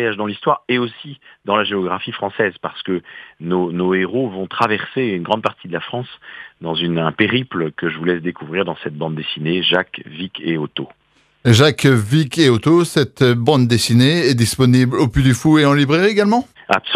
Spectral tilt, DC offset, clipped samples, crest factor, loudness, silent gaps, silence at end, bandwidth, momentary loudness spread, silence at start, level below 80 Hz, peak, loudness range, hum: -5.5 dB/octave; under 0.1%; under 0.1%; 16 dB; -17 LUFS; none; 0 s; 14.5 kHz; 14 LU; 0 s; -44 dBFS; 0 dBFS; 7 LU; none